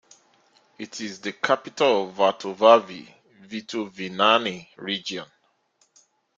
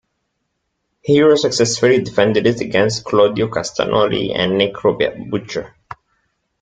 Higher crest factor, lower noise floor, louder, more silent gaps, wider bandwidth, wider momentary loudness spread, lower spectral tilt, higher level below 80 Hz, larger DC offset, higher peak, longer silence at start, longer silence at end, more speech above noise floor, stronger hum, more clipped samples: first, 22 dB vs 16 dB; second, -66 dBFS vs -72 dBFS; second, -23 LUFS vs -16 LUFS; neither; second, 7.6 kHz vs 9.4 kHz; first, 19 LU vs 10 LU; about the same, -3.5 dB/octave vs -4.5 dB/octave; second, -72 dBFS vs -50 dBFS; neither; about the same, -2 dBFS vs -2 dBFS; second, 0.8 s vs 1.05 s; first, 1.15 s vs 0.95 s; second, 43 dB vs 56 dB; neither; neither